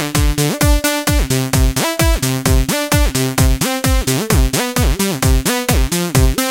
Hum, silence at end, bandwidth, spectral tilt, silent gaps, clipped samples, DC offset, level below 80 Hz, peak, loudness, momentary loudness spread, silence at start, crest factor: none; 0 s; 17 kHz; -4.5 dB/octave; none; under 0.1%; under 0.1%; -18 dBFS; 0 dBFS; -15 LUFS; 2 LU; 0 s; 14 dB